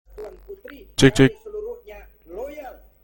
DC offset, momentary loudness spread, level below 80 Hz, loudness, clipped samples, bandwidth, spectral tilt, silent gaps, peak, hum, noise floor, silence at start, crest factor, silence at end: under 0.1%; 25 LU; -42 dBFS; -18 LUFS; under 0.1%; 17 kHz; -5.5 dB/octave; none; 0 dBFS; none; -44 dBFS; 0.2 s; 22 dB; 0.35 s